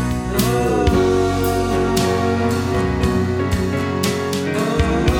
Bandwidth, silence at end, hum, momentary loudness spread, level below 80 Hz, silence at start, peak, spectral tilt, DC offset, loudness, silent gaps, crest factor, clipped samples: over 20 kHz; 0 s; none; 4 LU; -28 dBFS; 0 s; -4 dBFS; -6 dB/octave; under 0.1%; -18 LUFS; none; 14 dB; under 0.1%